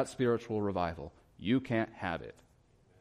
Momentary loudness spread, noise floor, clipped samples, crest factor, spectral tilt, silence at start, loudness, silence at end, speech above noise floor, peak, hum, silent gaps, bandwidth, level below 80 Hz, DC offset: 15 LU; -66 dBFS; under 0.1%; 16 dB; -6.5 dB/octave; 0 s; -34 LUFS; 0.7 s; 32 dB; -18 dBFS; none; none; 11 kHz; -60 dBFS; under 0.1%